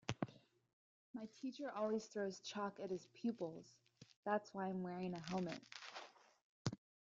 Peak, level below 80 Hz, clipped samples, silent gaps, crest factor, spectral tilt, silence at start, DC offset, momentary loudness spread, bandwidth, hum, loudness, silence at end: -22 dBFS; -80 dBFS; under 0.1%; 0.73-1.14 s, 4.16-4.23 s, 6.44-6.65 s; 24 dB; -5.5 dB/octave; 0.1 s; under 0.1%; 12 LU; 7.8 kHz; none; -47 LUFS; 0.25 s